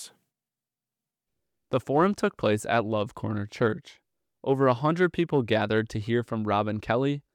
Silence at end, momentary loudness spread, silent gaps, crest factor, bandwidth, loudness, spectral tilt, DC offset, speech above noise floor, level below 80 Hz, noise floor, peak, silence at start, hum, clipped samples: 0.15 s; 8 LU; none; 18 dB; 15.5 kHz; -26 LUFS; -6.5 dB/octave; under 0.1%; over 64 dB; -60 dBFS; under -90 dBFS; -10 dBFS; 0 s; none; under 0.1%